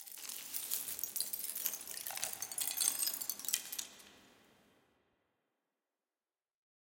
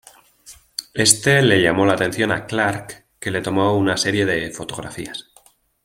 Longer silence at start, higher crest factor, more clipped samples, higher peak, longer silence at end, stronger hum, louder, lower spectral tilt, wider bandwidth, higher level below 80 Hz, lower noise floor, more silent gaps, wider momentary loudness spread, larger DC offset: second, 0 s vs 0.45 s; first, 32 dB vs 20 dB; neither; second, -10 dBFS vs 0 dBFS; first, 2.5 s vs 0.65 s; neither; second, -37 LUFS vs -18 LUFS; second, 2 dB/octave vs -3.5 dB/octave; about the same, 17 kHz vs 16.5 kHz; second, -86 dBFS vs -52 dBFS; first, under -90 dBFS vs -54 dBFS; neither; second, 11 LU vs 17 LU; neither